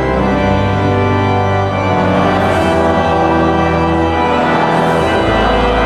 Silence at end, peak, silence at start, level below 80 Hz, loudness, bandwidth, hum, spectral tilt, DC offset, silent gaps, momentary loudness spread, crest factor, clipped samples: 0 s; -2 dBFS; 0 s; -28 dBFS; -12 LUFS; 12.5 kHz; none; -7 dB/octave; under 0.1%; none; 1 LU; 10 dB; under 0.1%